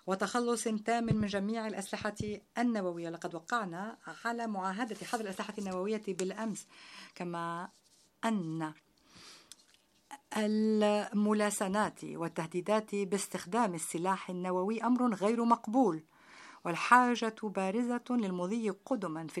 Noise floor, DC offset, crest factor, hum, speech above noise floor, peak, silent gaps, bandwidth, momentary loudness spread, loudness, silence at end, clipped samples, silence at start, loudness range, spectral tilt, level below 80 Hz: -68 dBFS; under 0.1%; 26 dB; none; 35 dB; -8 dBFS; none; 14.5 kHz; 13 LU; -34 LUFS; 0 s; under 0.1%; 0.05 s; 9 LU; -5 dB/octave; -70 dBFS